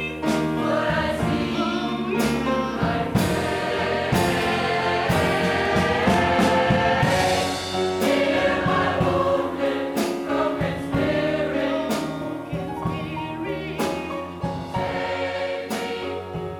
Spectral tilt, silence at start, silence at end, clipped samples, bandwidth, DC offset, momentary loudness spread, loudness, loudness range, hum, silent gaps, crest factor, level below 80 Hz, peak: -5.5 dB/octave; 0 s; 0 s; under 0.1%; 19.5 kHz; under 0.1%; 9 LU; -23 LUFS; 7 LU; none; none; 16 dB; -44 dBFS; -6 dBFS